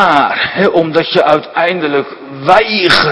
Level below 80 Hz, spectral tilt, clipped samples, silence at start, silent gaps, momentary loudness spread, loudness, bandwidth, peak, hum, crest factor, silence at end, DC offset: -46 dBFS; -5 dB/octave; 1%; 0 s; none; 7 LU; -11 LUFS; 11 kHz; 0 dBFS; none; 10 dB; 0 s; under 0.1%